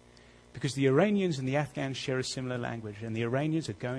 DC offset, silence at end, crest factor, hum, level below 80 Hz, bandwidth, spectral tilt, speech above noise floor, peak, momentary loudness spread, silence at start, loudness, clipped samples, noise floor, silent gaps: under 0.1%; 0 s; 20 dB; none; -64 dBFS; 11 kHz; -6 dB/octave; 26 dB; -12 dBFS; 12 LU; 0.55 s; -31 LUFS; under 0.1%; -57 dBFS; none